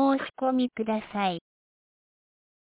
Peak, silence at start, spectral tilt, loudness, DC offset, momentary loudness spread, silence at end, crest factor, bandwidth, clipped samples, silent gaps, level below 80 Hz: -14 dBFS; 0 s; -4 dB/octave; -28 LUFS; under 0.1%; 4 LU; 1.3 s; 16 dB; 4 kHz; under 0.1%; none; -70 dBFS